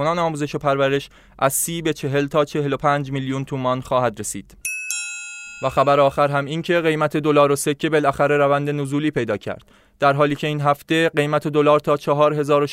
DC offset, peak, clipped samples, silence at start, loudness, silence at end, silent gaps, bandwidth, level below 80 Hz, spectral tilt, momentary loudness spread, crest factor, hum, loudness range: under 0.1%; -4 dBFS; under 0.1%; 0 s; -20 LUFS; 0 s; none; 16 kHz; -52 dBFS; -5 dB/octave; 9 LU; 16 dB; none; 4 LU